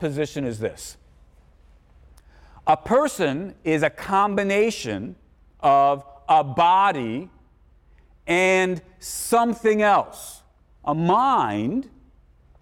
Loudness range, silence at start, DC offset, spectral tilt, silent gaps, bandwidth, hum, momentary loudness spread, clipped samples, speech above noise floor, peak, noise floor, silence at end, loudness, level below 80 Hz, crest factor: 4 LU; 0 s; under 0.1%; -5 dB/octave; none; 17.5 kHz; none; 15 LU; under 0.1%; 34 dB; -8 dBFS; -55 dBFS; 0.75 s; -21 LUFS; -54 dBFS; 14 dB